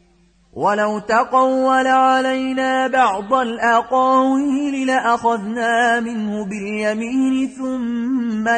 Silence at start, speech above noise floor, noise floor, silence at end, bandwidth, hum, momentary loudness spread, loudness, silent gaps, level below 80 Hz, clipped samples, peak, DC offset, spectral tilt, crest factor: 0.55 s; 38 dB; -55 dBFS; 0 s; 9.4 kHz; none; 8 LU; -17 LUFS; none; -58 dBFS; under 0.1%; -4 dBFS; under 0.1%; -4.5 dB/octave; 14 dB